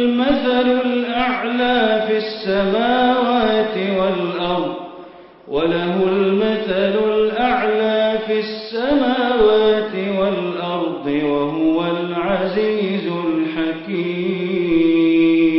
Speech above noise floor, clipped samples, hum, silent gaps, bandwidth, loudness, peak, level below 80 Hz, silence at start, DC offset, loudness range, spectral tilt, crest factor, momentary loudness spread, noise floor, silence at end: 23 dB; under 0.1%; none; none; 5.8 kHz; -18 LUFS; -4 dBFS; -50 dBFS; 0 s; under 0.1%; 3 LU; -11 dB/octave; 14 dB; 7 LU; -39 dBFS; 0 s